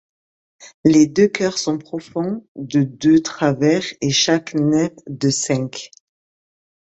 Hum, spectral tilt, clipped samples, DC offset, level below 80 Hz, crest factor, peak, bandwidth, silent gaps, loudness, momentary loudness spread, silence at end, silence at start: none; -4.5 dB/octave; under 0.1%; under 0.1%; -56 dBFS; 18 dB; 0 dBFS; 8.2 kHz; 0.74-0.84 s, 2.48-2.55 s; -18 LUFS; 11 LU; 1 s; 0.6 s